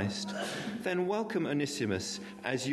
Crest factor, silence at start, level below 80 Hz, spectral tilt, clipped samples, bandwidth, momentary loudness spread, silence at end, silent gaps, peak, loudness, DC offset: 16 dB; 0 s; -70 dBFS; -4.5 dB/octave; under 0.1%; 12.5 kHz; 5 LU; 0 s; none; -18 dBFS; -34 LUFS; under 0.1%